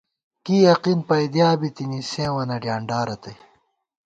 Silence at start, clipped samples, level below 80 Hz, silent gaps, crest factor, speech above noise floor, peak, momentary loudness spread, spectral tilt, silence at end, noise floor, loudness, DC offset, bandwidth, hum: 0.45 s; under 0.1%; -60 dBFS; none; 18 dB; 43 dB; -4 dBFS; 13 LU; -6.5 dB/octave; 0.7 s; -63 dBFS; -21 LUFS; under 0.1%; 8.8 kHz; none